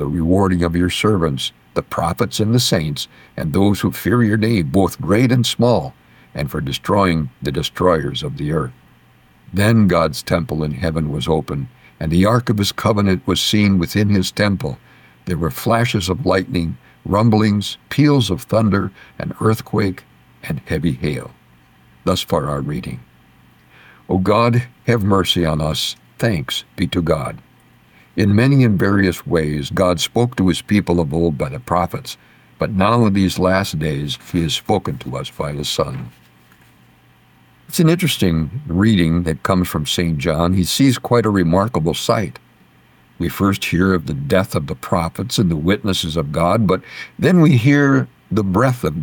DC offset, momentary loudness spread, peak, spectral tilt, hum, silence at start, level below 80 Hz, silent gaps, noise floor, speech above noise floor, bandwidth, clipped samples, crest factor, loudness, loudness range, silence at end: under 0.1%; 11 LU; -2 dBFS; -6 dB/octave; none; 0 s; -38 dBFS; none; -51 dBFS; 34 dB; 19 kHz; under 0.1%; 14 dB; -17 LUFS; 5 LU; 0 s